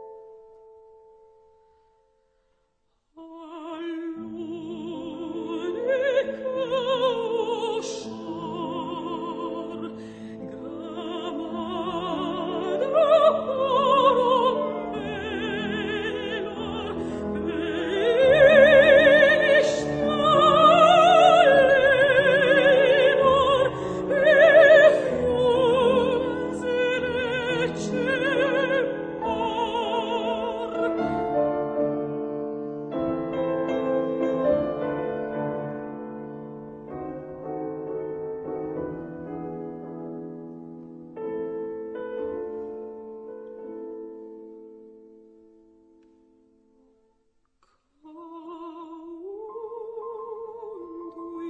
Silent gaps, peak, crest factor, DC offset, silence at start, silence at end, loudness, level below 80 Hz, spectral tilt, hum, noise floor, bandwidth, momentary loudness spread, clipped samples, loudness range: none; -4 dBFS; 20 dB; under 0.1%; 0 s; 0 s; -22 LUFS; -54 dBFS; -5 dB/octave; none; -71 dBFS; 9.2 kHz; 23 LU; under 0.1%; 20 LU